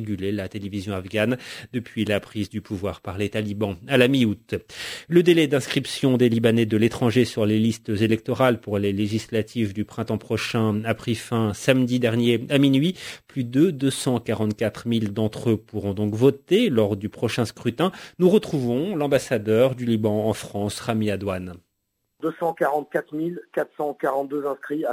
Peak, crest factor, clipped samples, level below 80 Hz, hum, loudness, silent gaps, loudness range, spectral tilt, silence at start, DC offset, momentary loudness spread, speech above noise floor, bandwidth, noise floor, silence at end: -2 dBFS; 20 dB; under 0.1%; -52 dBFS; none; -23 LUFS; none; 6 LU; -6 dB/octave; 0 s; under 0.1%; 11 LU; 53 dB; 16 kHz; -76 dBFS; 0 s